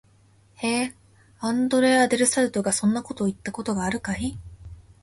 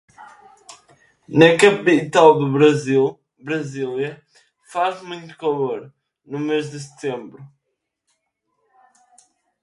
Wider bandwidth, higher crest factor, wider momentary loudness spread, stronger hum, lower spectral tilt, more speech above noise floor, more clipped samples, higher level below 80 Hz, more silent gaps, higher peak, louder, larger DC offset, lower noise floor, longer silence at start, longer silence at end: about the same, 11.5 kHz vs 11.5 kHz; about the same, 18 dB vs 20 dB; second, 13 LU vs 19 LU; neither; second, -4 dB/octave vs -5.5 dB/octave; second, 34 dB vs 59 dB; neither; first, -50 dBFS vs -64 dBFS; neither; second, -6 dBFS vs 0 dBFS; second, -24 LUFS vs -18 LUFS; neither; second, -57 dBFS vs -77 dBFS; first, 0.6 s vs 0.2 s; second, 0.2 s vs 2.15 s